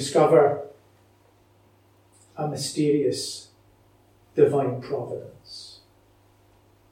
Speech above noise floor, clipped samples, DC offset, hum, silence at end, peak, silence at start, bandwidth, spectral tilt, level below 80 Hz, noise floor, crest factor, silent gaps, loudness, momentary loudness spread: 36 dB; under 0.1%; under 0.1%; none; 1.15 s; -6 dBFS; 0 s; 15.5 kHz; -5.5 dB/octave; -68 dBFS; -59 dBFS; 22 dB; none; -23 LUFS; 23 LU